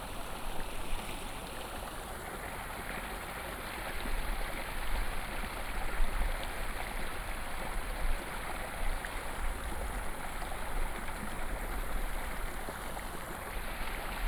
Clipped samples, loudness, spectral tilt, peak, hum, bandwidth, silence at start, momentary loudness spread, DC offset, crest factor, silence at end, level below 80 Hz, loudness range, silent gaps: under 0.1%; -40 LUFS; -3.5 dB/octave; -18 dBFS; none; over 20 kHz; 0 s; 3 LU; under 0.1%; 18 dB; 0 s; -38 dBFS; 2 LU; none